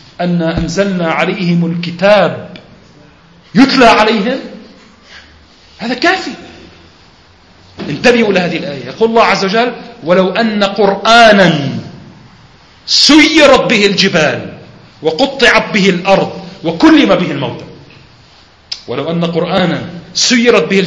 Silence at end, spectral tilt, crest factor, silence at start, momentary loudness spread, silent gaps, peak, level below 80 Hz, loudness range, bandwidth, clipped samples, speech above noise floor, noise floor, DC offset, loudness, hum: 0 s; -4.5 dB/octave; 12 dB; 0.2 s; 16 LU; none; 0 dBFS; -40 dBFS; 7 LU; 11 kHz; 0.7%; 33 dB; -43 dBFS; under 0.1%; -10 LUFS; none